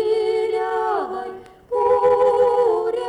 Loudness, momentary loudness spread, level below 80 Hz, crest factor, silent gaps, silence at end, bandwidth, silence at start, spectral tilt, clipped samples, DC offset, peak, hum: -19 LUFS; 11 LU; -56 dBFS; 12 dB; none; 0 s; 10 kHz; 0 s; -5 dB/octave; under 0.1%; under 0.1%; -8 dBFS; none